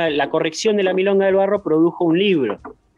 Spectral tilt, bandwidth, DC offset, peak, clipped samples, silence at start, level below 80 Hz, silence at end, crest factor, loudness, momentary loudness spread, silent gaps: -5.5 dB/octave; 10.5 kHz; under 0.1%; -6 dBFS; under 0.1%; 0 s; -58 dBFS; 0.25 s; 12 dB; -17 LUFS; 4 LU; none